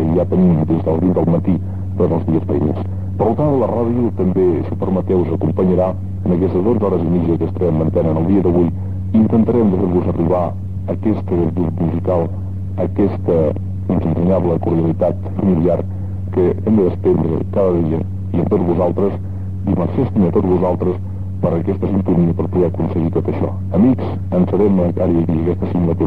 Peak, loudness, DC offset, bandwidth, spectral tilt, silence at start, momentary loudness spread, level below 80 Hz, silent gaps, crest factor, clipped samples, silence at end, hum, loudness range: -4 dBFS; -17 LUFS; 2%; 4.2 kHz; -11.5 dB/octave; 0 s; 6 LU; -38 dBFS; none; 12 dB; under 0.1%; 0 s; none; 2 LU